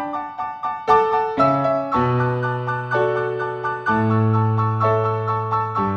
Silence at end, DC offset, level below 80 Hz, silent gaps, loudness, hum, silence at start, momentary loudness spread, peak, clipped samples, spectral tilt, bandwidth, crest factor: 0 s; under 0.1%; -52 dBFS; none; -20 LUFS; none; 0 s; 8 LU; -2 dBFS; under 0.1%; -9 dB/octave; 6.6 kHz; 18 dB